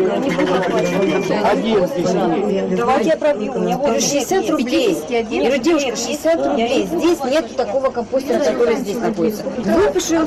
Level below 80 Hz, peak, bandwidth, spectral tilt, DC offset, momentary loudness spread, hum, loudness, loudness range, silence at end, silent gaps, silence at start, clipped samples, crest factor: -46 dBFS; -8 dBFS; 15 kHz; -4.5 dB/octave; under 0.1%; 4 LU; none; -17 LUFS; 1 LU; 0 s; none; 0 s; under 0.1%; 10 dB